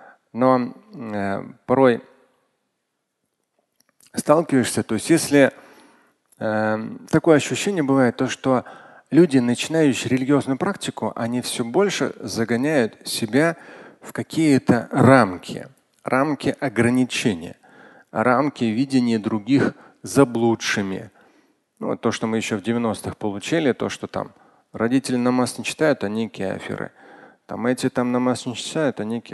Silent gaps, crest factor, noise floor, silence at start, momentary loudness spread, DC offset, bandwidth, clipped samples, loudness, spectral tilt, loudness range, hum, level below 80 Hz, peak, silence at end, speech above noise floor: none; 20 dB; -76 dBFS; 0.35 s; 13 LU; under 0.1%; 12.5 kHz; under 0.1%; -21 LUFS; -5.5 dB/octave; 5 LU; none; -58 dBFS; 0 dBFS; 0 s; 56 dB